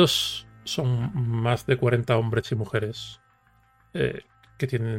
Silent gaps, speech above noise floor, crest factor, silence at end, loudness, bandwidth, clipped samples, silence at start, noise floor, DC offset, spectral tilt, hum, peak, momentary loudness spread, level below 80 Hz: none; 37 dB; 18 dB; 0 s; -26 LUFS; 16 kHz; under 0.1%; 0 s; -61 dBFS; under 0.1%; -5.5 dB/octave; none; -6 dBFS; 12 LU; -54 dBFS